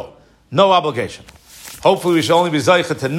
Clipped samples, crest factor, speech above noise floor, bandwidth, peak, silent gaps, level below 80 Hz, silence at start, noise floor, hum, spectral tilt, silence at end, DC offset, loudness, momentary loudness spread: under 0.1%; 16 dB; 23 dB; 16 kHz; 0 dBFS; none; -54 dBFS; 0 s; -38 dBFS; none; -5 dB/octave; 0 s; under 0.1%; -15 LUFS; 14 LU